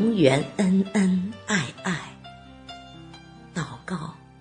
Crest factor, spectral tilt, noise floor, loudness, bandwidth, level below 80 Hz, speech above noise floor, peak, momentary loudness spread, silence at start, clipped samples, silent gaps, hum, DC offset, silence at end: 22 dB; -6 dB/octave; -45 dBFS; -25 LUFS; 10 kHz; -56 dBFS; 25 dB; -4 dBFS; 24 LU; 0 s; under 0.1%; none; none; under 0.1%; 0.25 s